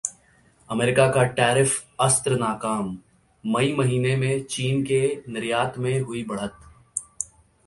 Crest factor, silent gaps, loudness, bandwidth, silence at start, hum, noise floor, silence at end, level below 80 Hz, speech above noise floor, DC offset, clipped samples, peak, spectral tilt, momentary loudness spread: 20 dB; none; -23 LUFS; 11.5 kHz; 0.05 s; none; -58 dBFS; 0.4 s; -56 dBFS; 35 dB; under 0.1%; under 0.1%; -4 dBFS; -4.5 dB/octave; 13 LU